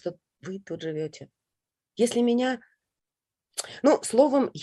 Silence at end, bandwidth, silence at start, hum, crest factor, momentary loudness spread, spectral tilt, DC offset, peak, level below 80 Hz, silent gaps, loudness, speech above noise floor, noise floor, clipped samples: 0 s; 12.5 kHz; 0.05 s; none; 20 dB; 18 LU; -4.5 dB/octave; under 0.1%; -6 dBFS; -74 dBFS; none; -25 LUFS; 64 dB; -90 dBFS; under 0.1%